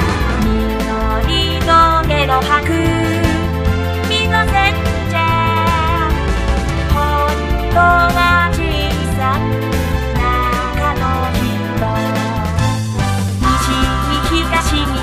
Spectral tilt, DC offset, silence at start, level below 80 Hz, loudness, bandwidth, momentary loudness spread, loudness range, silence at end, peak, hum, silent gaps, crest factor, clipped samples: -5.5 dB/octave; under 0.1%; 0 s; -20 dBFS; -15 LUFS; 15.5 kHz; 6 LU; 3 LU; 0 s; 0 dBFS; none; none; 14 dB; under 0.1%